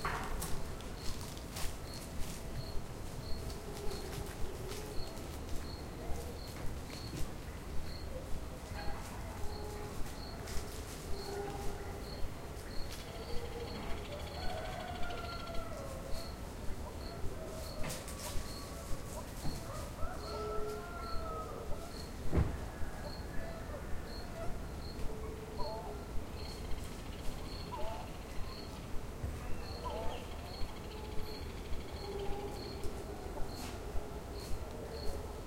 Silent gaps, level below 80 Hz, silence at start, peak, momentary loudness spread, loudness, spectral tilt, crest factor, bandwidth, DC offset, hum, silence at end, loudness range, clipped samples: none; -44 dBFS; 0 s; -20 dBFS; 4 LU; -44 LUFS; -5 dB/octave; 20 dB; 16 kHz; under 0.1%; none; 0 s; 3 LU; under 0.1%